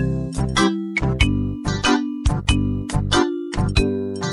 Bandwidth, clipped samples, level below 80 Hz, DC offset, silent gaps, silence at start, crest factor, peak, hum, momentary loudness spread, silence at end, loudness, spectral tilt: 12 kHz; under 0.1%; -28 dBFS; under 0.1%; none; 0 s; 18 dB; -2 dBFS; none; 5 LU; 0 s; -21 LUFS; -5 dB/octave